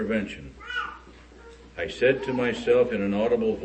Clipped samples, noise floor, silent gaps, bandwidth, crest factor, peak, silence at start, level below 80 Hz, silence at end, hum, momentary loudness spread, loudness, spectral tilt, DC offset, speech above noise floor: under 0.1%; -48 dBFS; none; 8.6 kHz; 18 dB; -10 dBFS; 0 s; -50 dBFS; 0 s; none; 15 LU; -25 LUFS; -6 dB/octave; under 0.1%; 23 dB